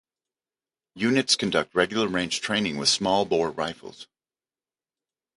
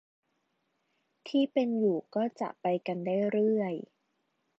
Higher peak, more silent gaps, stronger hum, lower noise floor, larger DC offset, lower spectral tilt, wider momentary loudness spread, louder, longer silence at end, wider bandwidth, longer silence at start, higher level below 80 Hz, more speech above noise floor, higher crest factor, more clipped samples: first, -6 dBFS vs -16 dBFS; neither; neither; first, under -90 dBFS vs -78 dBFS; neither; second, -3 dB/octave vs -8 dB/octave; first, 10 LU vs 7 LU; first, -24 LUFS vs -30 LUFS; first, 1.3 s vs 0.8 s; first, 11.5 kHz vs 7.4 kHz; second, 0.95 s vs 1.25 s; first, -60 dBFS vs -86 dBFS; first, over 65 dB vs 49 dB; first, 22 dB vs 16 dB; neither